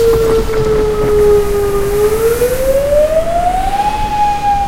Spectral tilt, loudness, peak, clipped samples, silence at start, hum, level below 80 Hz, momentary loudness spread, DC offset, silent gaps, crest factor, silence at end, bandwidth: -5 dB/octave; -13 LUFS; 0 dBFS; under 0.1%; 0 s; none; -22 dBFS; 4 LU; under 0.1%; none; 12 dB; 0 s; 16 kHz